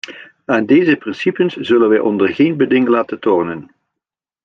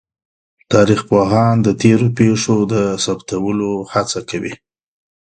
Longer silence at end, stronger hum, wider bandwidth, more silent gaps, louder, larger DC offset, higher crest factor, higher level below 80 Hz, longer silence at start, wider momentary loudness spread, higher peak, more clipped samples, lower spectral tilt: first, 0.85 s vs 0.65 s; neither; second, 7 kHz vs 9.4 kHz; neither; about the same, -15 LUFS vs -15 LUFS; neither; about the same, 14 dB vs 16 dB; second, -60 dBFS vs -46 dBFS; second, 0.1 s vs 0.7 s; about the same, 10 LU vs 8 LU; about the same, -2 dBFS vs 0 dBFS; neither; about the same, -7 dB/octave vs -6 dB/octave